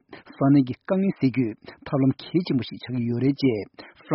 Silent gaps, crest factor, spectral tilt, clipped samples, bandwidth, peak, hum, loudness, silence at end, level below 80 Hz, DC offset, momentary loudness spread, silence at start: none; 16 dB; -7.5 dB/octave; under 0.1%; 5.8 kHz; -8 dBFS; none; -24 LUFS; 0 s; -60 dBFS; under 0.1%; 10 LU; 0.1 s